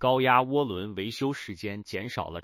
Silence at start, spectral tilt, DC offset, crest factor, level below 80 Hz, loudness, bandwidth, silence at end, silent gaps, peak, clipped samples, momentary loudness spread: 0 s; -6 dB/octave; under 0.1%; 20 dB; -58 dBFS; -28 LUFS; 16 kHz; 0 s; none; -8 dBFS; under 0.1%; 13 LU